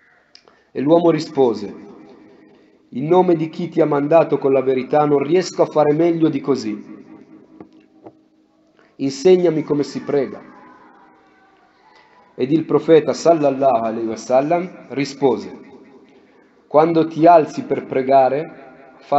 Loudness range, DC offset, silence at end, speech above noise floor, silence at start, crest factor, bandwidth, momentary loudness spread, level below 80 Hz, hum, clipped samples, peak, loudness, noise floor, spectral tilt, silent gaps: 5 LU; under 0.1%; 0 s; 40 dB; 0.75 s; 18 dB; 8.2 kHz; 13 LU; -68 dBFS; none; under 0.1%; 0 dBFS; -17 LUFS; -57 dBFS; -7 dB/octave; none